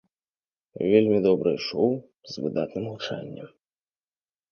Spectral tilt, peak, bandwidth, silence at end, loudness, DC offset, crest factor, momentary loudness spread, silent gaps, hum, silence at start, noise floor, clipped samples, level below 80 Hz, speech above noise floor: -7 dB/octave; -6 dBFS; 6.8 kHz; 1.05 s; -25 LUFS; under 0.1%; 22 dB; 16 LU; none; none; 0.75 s; under -90 dBFS; under 0.1%; -66 dBFS; over 65 dB